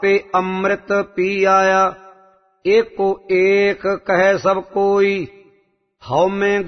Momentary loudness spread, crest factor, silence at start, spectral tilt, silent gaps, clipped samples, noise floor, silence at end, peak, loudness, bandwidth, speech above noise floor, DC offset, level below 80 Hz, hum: 7 LU; 14 dB; 0 s; -5.5 dB/octave; none; under 0.1%; -60 dBFS; 0 s; -2 dBFS; -17 LUFS; 6.4 kHz; 44 dB; under 0.1%; -54 dBFS; none